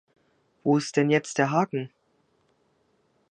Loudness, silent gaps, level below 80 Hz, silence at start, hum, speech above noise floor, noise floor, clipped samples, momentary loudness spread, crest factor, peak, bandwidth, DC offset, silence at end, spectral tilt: -25 LUFS; none; -76 dBFS; 0.65 s; none; 45 dB; -68 dBFS; under 0.1%; 10 LU; 20 dB; -8 dBFS; 9.6 kHz; under 0.1%; 1.45 s; -5.5 dB/octave